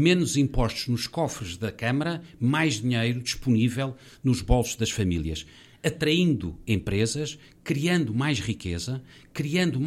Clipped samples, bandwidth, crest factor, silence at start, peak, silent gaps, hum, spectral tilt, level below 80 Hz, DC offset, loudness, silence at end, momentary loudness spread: under 0.1%; 15 kHz; 18 dB; 0 s; -8 dBFS; none; none; -5 dB/octave; -40 dBFS; under 0.1%; -26 LUFS; 0 s; 10 LU